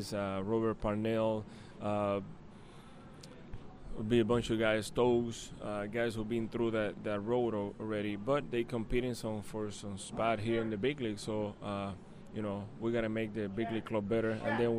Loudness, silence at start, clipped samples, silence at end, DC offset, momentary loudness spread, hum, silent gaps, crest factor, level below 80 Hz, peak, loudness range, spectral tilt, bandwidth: -35 LUFS; 0 s; under 0.1%; 0 s; under 0.1%; 19 LU; none; none; 18 dB; -54 dBFS; -16 dBFS; 4 LU; -6 dB/octave; 13 kHz